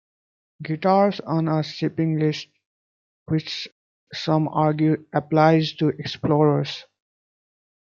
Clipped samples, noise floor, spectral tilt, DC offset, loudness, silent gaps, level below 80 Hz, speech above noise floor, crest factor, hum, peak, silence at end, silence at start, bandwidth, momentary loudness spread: under 0.1%; under -90 dBFS; -7.5 dB/octave; under 0.1%; -22 LUFS; 2.66-3.26 s, 3.72-4.07 s; -64 dBFS; over 69 dB; 20 dB; none; -2 dBFS; 1 s; 0.6 s; 7 kHz; 13 LU